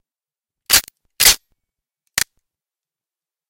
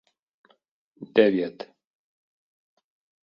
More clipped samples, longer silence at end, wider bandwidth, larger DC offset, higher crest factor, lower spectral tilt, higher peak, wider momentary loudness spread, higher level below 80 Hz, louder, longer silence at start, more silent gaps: neither; second, 1.25 s vs 1.6 s; first, 17 kHz vs 5.6 kHz; neither; about the same, 22 dB vs 24 dB; second, 1.5 dB/octave vs -8 dB/octave; first, 0 dBFS vs -4 dBFS; second, 12 LU vs 23 LU; first, -44 dBFS vs -72 dBFS; first, -15 LUFS vs -23 LUFS; second, 0.7 s vs 1 s; neither